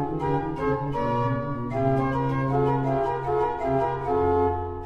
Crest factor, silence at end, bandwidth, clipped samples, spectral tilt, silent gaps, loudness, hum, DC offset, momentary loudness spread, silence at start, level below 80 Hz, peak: 14 dB; 0 s; 7.8 kHz; under 0.1%; -9 dB/octave; none; -25 LUFS; none; under 0.1%; 3 LU; 0 s; -42 dBFS; -10 dBFS